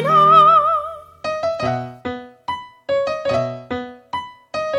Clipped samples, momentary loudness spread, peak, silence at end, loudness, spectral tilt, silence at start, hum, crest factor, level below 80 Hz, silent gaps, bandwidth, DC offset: under 0.1%; 19 LU; -2 dBFS; 0 s; -16 LUFS; -6 dB/octave; 0 s; none; 16 dB; -54 dBFS; none; 11.5 kHz; under 0.1%